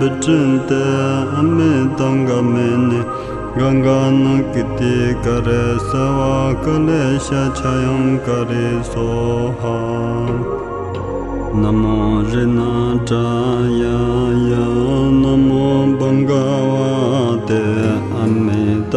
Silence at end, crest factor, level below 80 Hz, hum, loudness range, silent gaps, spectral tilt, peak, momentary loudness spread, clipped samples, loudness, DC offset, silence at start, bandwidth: 0 s; 12 dB; -32 dBFS; none; 4 LU; none; -7.5 dB/octave; -2 dBFS; 6 LU; under 0.1%; -16 LUFS; under 0.1%; 0 s; 10.5 kHz